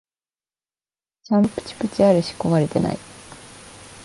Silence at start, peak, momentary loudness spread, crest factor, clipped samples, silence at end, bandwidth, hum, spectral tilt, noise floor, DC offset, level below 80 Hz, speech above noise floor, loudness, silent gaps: 1.3 s; -4 dBFS; 23 LU; 20 dB; under 0.1%; 0 s; 11.5 kHz; none; -7 dB/octave; under -90 dBFS; under 0.1%; -52 dBFS; over 71 dB; -20 LUFS; none